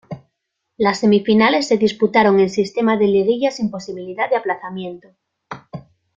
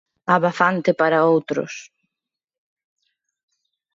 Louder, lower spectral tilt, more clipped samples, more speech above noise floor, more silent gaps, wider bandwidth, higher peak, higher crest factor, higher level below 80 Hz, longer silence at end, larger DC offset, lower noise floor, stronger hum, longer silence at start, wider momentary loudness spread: about the same, -17 LUFS vs -19 LUFS; about the same, -5.5 dB/octave vs -6 dB/octave; neither; second, 59 dB vs 67 dB; neither; about the same, 7.6 kHz vs 7.6 kHz; about the same, -2 dBFS vs -2 dBFS; about the same, 16 dB vs 20 dB; first, -58 dBFS vs -70 dBFS; second, 0.35 s vs 2.1 s; neither; second, -75 dBFS vs -86 dBFS; neither; second, 0.1 s vs 0.3 s; first, 22 LU vs 12 LU